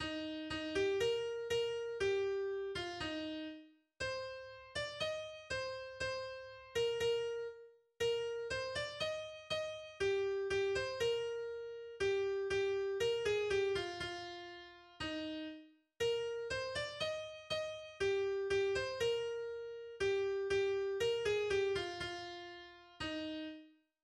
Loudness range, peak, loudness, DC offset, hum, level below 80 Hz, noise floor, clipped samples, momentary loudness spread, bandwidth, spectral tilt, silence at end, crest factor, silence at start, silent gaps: 5 LU; -24 dBFS; -39 LUFS; under 0.1%; none; -64 dBFS; -59 dBFS; under 0.1%; 12 LU; 12.5 kHz; -3.5 dB/octave; 0.35 s; 16 dB; 0 s; none